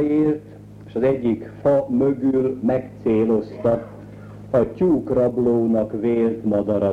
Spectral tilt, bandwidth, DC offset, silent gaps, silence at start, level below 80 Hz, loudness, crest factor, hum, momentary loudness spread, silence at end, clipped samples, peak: -10 dB/octave; 7.6 kHz; under 0.1%; none; 0 s; -48 dBFS; -21 LUFS; 14 dB; none; 7 LU; 0 s; under 0.1%; -6 dBFS